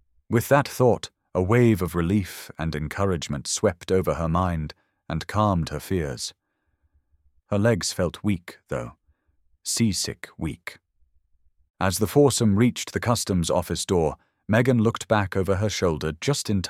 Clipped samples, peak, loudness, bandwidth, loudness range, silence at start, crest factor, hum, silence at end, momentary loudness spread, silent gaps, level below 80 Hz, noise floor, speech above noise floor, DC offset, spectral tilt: under 0.1%; -4 dBFS; -24 LUFS; 16.5 kHz; 6 LU; 0.3 s; 20 dB; none; 0 s; 13 LU; 11.70-11.74 s; -46 dBFS; -71 dBFS; 48 dB; under 0.1%; -5.5 dB/octave